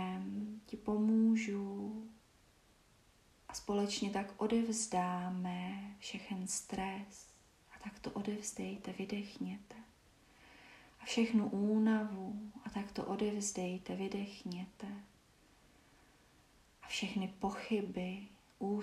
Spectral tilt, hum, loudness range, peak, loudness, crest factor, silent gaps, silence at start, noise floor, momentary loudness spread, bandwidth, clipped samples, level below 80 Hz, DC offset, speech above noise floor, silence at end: -5 dB/octave; none; 8 LU; -22 dBFS; -39 LUFS; 18 dB; none; 0 s; -68 dBFS; 18 LU; 13 kHz; under 0.1%; -70 dBFS; under 0.1%; 30 dB; 0 s